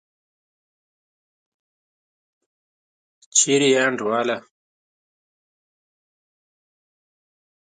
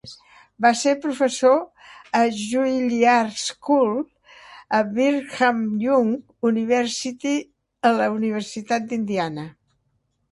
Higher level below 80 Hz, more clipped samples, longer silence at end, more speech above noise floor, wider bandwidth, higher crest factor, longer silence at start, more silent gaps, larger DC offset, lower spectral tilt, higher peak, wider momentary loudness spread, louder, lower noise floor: second, -78 dBFS vs -66 dBFS; neither; first, 3.35 s vs 0.8 s; first, over 71 dB vs 49 dB; second, 9.6 kHz vs 11.5 kHz; first, 24 dB vs 18 dB; first, 3.35 s vs 0.05 s; neither; neither; second, -2 dB/octave vs -4 dB/octave; about the same, -4 dBFS vs -2 dBFS; about the same, 9 LU vs 9 LU; about the same, -19 LUFS vs -21 LUFS; first, under -90 dBFS vs -70 dBFS